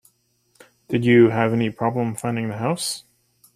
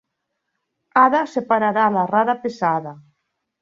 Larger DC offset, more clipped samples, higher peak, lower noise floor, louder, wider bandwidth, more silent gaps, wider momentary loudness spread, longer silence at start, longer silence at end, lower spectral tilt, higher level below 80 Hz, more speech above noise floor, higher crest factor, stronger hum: neither; neither; about the same, -4 dBFS vs -2 dBFS; second, -65 dBFS vs -77 dBFS; about the same, -20 LUFS vs -19 LUFS; first, 15 kHz vs 7.6 kHz; neither; first, 11 LU vs 6 LU; about the same, 0.9 s vs 0.95 s; about the same, 0.55 s vs 0.6 s; about the same, -6 dB/octave vs -6.5 dB/octave; first, -58 dBFS vs -70 dBFS; second, 45 dB vs 59 dB; about the same, 18 dB vs 18 dB; neither